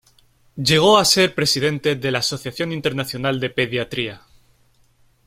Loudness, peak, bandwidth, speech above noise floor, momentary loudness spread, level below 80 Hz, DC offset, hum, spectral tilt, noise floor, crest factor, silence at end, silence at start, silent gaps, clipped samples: -19 LUFS; -2 dBFS; 16.5 kHz; 38 dB; 12 LU; -54 dBFS; under 0.1%; none; -3.5 dB/octave; -58 dBFS; 20 dB; 1.1 s; 0.55 s; none; under 0.1%